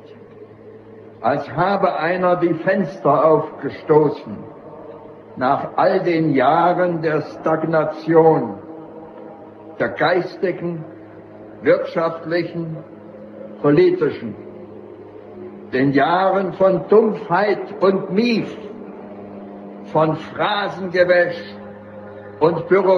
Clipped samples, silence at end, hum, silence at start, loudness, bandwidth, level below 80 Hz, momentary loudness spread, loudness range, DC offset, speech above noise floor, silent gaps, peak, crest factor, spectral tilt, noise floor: under 0.1%; 0 s; none; 0.05 s; -18 LUFS; 6.6 kHz; -62 dBFS; 22 LU; 5 LU; under 0.1%; 23 dB; none; -2 dBFS; 18 dB; -8 dB/octave; -41 dBFS